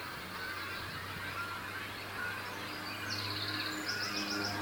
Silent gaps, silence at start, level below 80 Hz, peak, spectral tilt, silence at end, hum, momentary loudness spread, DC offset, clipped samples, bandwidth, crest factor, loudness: none; 0 s; -64 dBFS; -22 dBFS; -3 dB/octave; 0 s; none; 6 LU; under 0.1%; under 0.1%; 19 kHz; 18 dB; -38 LUFS